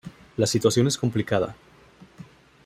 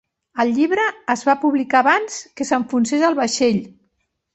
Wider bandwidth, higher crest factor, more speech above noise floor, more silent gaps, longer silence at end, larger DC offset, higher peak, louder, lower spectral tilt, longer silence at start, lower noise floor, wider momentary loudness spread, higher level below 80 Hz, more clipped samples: first, 16 kHz vs 8.2 kHz; about the same, 20 dB vs 18 dB; second, 29 dB vs 52 dB; neither; second, 0.4 s vs 0.65 s; neither; second, -6 dBFS vs -2 dBFS; second, -23 LUFS vs -18 LUFS; about the same, -5 dB/octave vs -4 dB/octave; second, 0.05 s vs 0.35 s; second, -52 dBFS vs -70 dBFS; about the same, 9 LU vs 8 LU; first, -56 dBFS vs -62 dBFS; neither